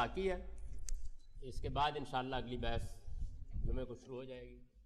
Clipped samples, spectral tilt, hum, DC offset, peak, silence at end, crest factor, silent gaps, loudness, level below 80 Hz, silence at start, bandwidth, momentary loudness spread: under 0.1%; -5.5 dB/octave; none; under 0.1%; -24 dBFS; 0 s; 16 dB; none; -43 LUFS; -46 dBFS; 0 s; 12 kHz; 15 LU